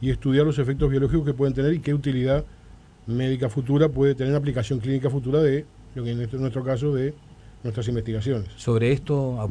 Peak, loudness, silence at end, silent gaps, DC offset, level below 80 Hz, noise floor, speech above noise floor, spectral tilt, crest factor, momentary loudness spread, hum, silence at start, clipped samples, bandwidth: -8 dBFS; -24 LUFS; 0 s; none; under 0.1%; -40 dBFS; -48 dBFS; 25 dB; -8 dB/octave; 16 dB; 9 LU; none; 0 s; under 0.1%; 10 kHz